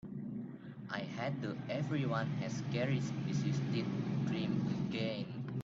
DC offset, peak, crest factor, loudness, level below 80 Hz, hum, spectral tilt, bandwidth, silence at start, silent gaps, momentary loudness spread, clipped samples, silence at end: under 0.1%; -22 dBFS; 14 dB; -38 LUFS; -68 dBFS; none; -7 dB/octave; 7.6 kHz; 0.05 s; none; 8 LU; under 0.1%; 0 s